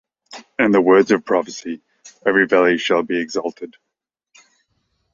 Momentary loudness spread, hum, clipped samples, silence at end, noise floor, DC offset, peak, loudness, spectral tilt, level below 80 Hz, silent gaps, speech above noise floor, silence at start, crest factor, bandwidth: 18 LU; none; under 0.1%; 1.45 s; -81 dBFS; under 0.1%; -2 dBFS; -17 LUFS; -5 dB/octave; -62 dBFS; none; 64 dB; 0.3 s; 18 dB; 7.6 kHz